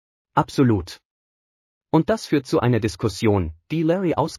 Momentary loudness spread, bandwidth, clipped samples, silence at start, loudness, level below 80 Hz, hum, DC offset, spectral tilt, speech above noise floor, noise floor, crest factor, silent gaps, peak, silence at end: 5 LU; 13.5 kHz; under 0.1%; 0.35 s; -21 LUFS; -46 dBFS; none; under 0.1%; -7 dB/octave; over 70 dB; under -90 dBFS; 18 dB; 1.05-1.81 s; -4 dBFS; 0 s